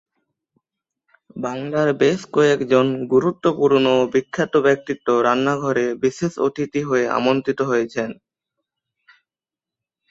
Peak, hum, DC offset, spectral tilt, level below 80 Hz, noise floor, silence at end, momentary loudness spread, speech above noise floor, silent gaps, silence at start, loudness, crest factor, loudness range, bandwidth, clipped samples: -2 dBFS; none; under 0.1%; -6 dB/octave; -62 dBFS; -90 dBFS; 1.95 s; 8 LU; 71 dB; none; 1.35 s; -19 LUFS; 18 dB; 5 LU; 8 kHz; under 0.1%